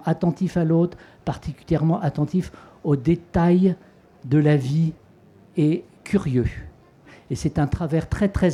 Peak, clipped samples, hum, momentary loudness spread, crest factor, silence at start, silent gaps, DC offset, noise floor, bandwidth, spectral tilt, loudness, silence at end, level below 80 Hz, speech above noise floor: -6 dBFS; under 0.1%; none; 12 LU; 16 dB; 0 s; none; under 0.1%; -51 dBFS; 11 kHz; -8.5 dB/octave; -22 LUFS; 0 s; -40 dBFS; 30 dB